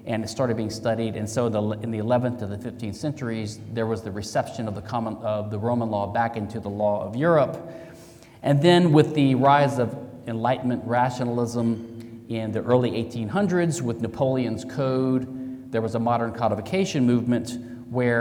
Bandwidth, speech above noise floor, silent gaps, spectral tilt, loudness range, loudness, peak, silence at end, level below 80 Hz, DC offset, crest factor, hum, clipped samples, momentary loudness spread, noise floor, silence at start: 16 kHz; 23 dB; none; -6.5 dB/octave; 7 LU; -24 LUFS; -4 dBFS; 0 s; -60 dBFS; under 0.1%; 20 dB; none; under 0.1%; 13 LU; -47 dBFS; 0 s